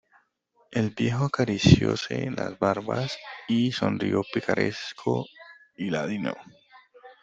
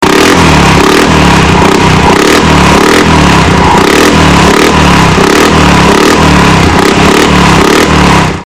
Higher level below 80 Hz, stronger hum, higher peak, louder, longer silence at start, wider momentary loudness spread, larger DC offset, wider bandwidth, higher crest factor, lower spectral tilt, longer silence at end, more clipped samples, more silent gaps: second, -52 dBFS vs -18 dBFS; neither; about the same, -2 dBFS vs 0 dBFS; second, -26 LUFS vs -4 LUFS; first, 0.7 s vs 0 s; first, 12 LU vs 1 LU; second, under 0.1% vs 4%; second, 8 kHz vs over 20 kHz; first, 24 dB vs 4 dB; first, -6 dB/octave vs -4.5 dB/octave; about the same, 0.1 s vs 0 s; second, under 0.1% vs 10%; neither